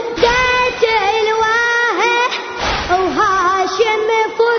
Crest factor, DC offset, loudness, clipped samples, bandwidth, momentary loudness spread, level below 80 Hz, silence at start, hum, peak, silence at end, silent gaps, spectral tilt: 14 dB; under 0.1%; -14 LUFS; under 0.1%; 6.6 kHz; 3 LU; -38 dBFS; 0 s; none; 0 dBFS; 0 s; none; -3 dB/octave